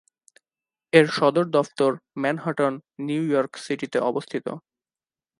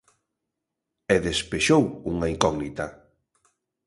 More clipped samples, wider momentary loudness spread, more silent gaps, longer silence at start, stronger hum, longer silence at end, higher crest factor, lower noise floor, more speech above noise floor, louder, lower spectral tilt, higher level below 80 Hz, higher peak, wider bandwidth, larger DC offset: neither; about the same, 13 LU vs 14 LU; neither; second, 0.95 s vs 1.1 s; neither; second, 0.8 s vs 0.95 s; about the same, 24 dB vs 26 dB; first, under -90 dBFS vs -83 dBFS; first, over 67 dB vs 60 dB; about the same, -23 LUFS vs -24 LUFS; first, -6 dB/octave vs -4.5 dB/octave; second, -76 dBFS vs -46 dBFS; about the same, 0 dBFS vs -2 dBFS; about the same, 11.5 kHz vs 11.5 kHz; neither